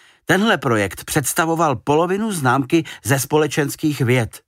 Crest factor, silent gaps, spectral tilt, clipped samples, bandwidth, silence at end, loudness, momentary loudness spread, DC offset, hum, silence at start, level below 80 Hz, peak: 16 dB; none; -5 dB/octave; under 0.1%; 16 kHz; 0.1 s; -18 LUFS; 4 LU; under 0.1%; none; 0.3 s; -50 dBFS; -4 dBFS